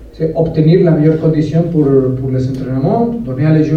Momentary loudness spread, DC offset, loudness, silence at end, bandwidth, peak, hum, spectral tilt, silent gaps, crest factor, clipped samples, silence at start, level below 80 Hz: 7 LU; under 0.1%; -13 LUFS; 0 s; 6.4 kHz; 0 dBFS; none; -10 dB/octave; none; 12 dB; under 0.1%; 0 s; -36 dBFS